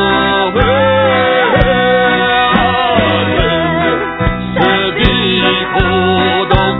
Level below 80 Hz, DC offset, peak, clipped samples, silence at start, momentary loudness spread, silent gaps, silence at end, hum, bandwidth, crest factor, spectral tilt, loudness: -24 dBFS; under 0.1%; 0 dBFS; 0.1%; 0 s; 3 LU; none; 0 s; none; 5.4 kHz; 12 dB; -8.5 dB/octave; -11 LUFS